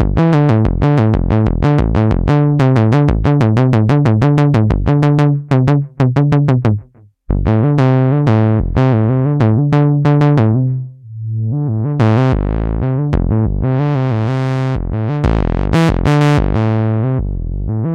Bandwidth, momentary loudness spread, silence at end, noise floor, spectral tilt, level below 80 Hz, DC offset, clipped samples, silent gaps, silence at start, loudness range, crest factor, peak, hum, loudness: 7.8 kHz; 7 LU; 0 s; -40 dBFS; -9 dB/octave; -24 dBFS; under 0.1%; under 0.1%; none; 0 s; 4 LU; 10 dB; -2 dBFS; none; -13 LUFS